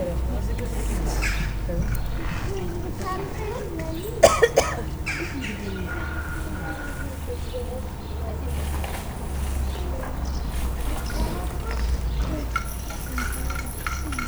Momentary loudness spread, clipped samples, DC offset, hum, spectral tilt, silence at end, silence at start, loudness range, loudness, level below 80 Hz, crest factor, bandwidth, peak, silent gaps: 6 LU; under 0.1%; under 0.1%; none; -5 dB/octave; 0 s; 0 s; 7 LU; -28 LUFS; -30 dBFS; 26 dB; over 20 kHz; 0 dBFS; none